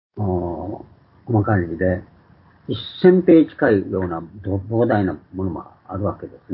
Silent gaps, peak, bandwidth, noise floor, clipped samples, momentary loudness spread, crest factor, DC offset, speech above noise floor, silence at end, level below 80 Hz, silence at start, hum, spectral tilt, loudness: none; -2 dBFS; 5 kHz; -51 dBFS; under 0.1%; 17 LU; 18 dB; under 0.1%; 32 dB; 0 s; -42 dBFS; 0.15 s; none; -12.5 dB/octave; -20 LUFS